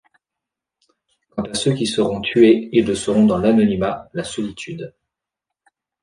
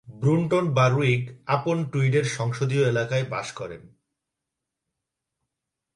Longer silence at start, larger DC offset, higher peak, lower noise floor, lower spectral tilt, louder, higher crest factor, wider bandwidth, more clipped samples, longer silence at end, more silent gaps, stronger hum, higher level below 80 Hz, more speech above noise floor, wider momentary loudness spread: first, 1.35 s vs 0.05 s; neither; first, -2 dBFS vs -8 dBFS; about the same, -84 dBFS vs -85 dBFS; about the same, -5.5 dB/octave vs -6.5 dB/octave; first, -18 LUFS vs -24 LUFS; about the same, 18 dB vs 18 dB; about the same, 10.5 kHz vs 11 kHz; neither; second, 1.15 s vs 2.1 s; neither; neither; first, -50 dBFS vs -62 dBFS; first, 67 dB vs 61 dB; first, 17 LU vs 12 LU